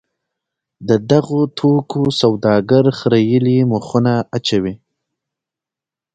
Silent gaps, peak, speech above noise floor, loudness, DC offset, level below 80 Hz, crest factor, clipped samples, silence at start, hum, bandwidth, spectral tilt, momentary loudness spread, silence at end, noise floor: none; 0 dBFS; 73 dB; -15 LUFS; under 0.1%; -52 dBFS; 16 dB; under 0.1%; 0.8 s; none; 9 kHz; -7 dB/octave; 5 LU; 1.4 s; -88 dBFS